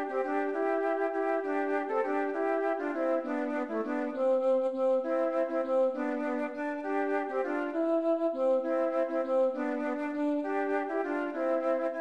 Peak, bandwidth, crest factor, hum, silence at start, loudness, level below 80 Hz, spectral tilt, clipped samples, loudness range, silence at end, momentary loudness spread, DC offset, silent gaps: -18 dBFS; 8.2 kHz; 12 dB; none; 0 s; -30 LUFS; -80 dBFS; -5.5 dB/octave; under 0.1%; 1 LU; 0 s; 4 LU; 0.1%; none